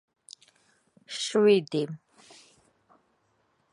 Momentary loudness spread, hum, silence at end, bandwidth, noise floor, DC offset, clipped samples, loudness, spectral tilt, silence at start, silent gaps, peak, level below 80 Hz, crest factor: 27 LU; none; 1.75 s; 11 kHz; -71 dBFS; under 0.1%; under 0.1%; -26 LUFS; -4.5 dB/octave; 1.1 s; none; -10 dBFS; -82 dBFS; 22 dB